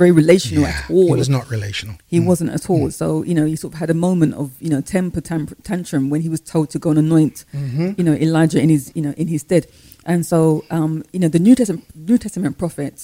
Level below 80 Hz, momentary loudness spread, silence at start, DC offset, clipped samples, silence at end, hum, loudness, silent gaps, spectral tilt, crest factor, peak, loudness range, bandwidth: -44 dBFS; 10 LU; 0 s; under 0.1%; under 0.1%; 0 s; none; -18 LUFS; none; -7 dB/octave; 16 dB; 0 dBFS; 3 LU; 16 kHz